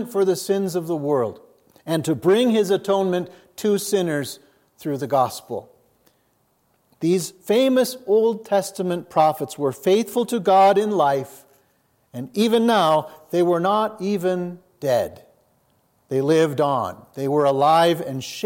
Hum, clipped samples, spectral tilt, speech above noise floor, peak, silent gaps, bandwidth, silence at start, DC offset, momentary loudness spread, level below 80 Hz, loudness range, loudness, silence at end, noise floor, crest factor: none; under 0.1%; -5.5 dB/octave; 45 dB; -4 dBFS; none; 17 kHz; 0 s; under 0.1%; 12 LU; -70 dBFS; 5 LU; -21 LUFS; 0 s; -65 dBFS; 16 dB